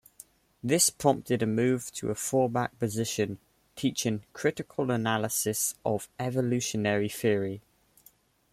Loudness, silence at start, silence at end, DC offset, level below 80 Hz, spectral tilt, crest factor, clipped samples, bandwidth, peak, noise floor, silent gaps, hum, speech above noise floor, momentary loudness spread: -29 LUFS; 0.65 s; 0.95 s; under 0.1%; -64 dBFS; -4 dB/octave; 20 dB; under 0.1%; 16 kHz; -8 dBFS; -62 dBFS; none; none; 34 dB; 7 LU